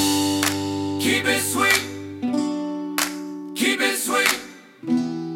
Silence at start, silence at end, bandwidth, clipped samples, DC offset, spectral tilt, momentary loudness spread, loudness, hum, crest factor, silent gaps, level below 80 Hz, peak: 0 s; 0 s; 18 kHz; under 0.1%; under 0.1%; -2.5 dB/octave; 11 LU; -21 LUFS; none; 22 dB; none; -62 dBFS; 0 dBFS